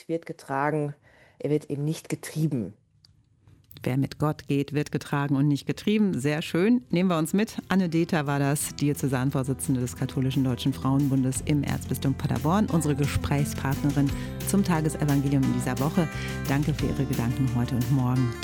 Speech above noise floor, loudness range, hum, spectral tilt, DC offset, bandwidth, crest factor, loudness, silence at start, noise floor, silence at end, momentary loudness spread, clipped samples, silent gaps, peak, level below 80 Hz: 35 dB; 5 LU; none; -6.5 dB/octave; under 0.1%; 17.5 kHz; 16 dB; -26 LUFS; 0.1 s; -60 dBFS; 0 s; 6 LU; under 0.1%; none; -8 dBFS; -46 dBFS